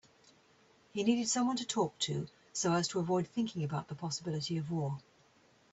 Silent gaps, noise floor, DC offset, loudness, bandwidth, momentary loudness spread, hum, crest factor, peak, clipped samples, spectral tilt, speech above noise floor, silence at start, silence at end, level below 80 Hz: none; -67 dBFS; under 0.1%; -35 LUFS; 8.4 kHz; 8 LU; none; 18 dB; -18 dBFS; under 0.1%; -4.5 dB/octave; 33 dB; 0.95 s; 0.75 s; -72 dBFS